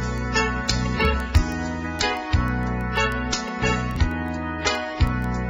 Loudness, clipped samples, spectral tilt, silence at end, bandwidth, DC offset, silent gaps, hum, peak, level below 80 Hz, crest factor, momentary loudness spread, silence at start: -24 LUFS; under 0.1%; -5 dB/octave; 0 s; 15.5 kHz; under 0.1%; none; none; -4 dBFS; -28 dBFS; 18 dB; 4 LU; 0 s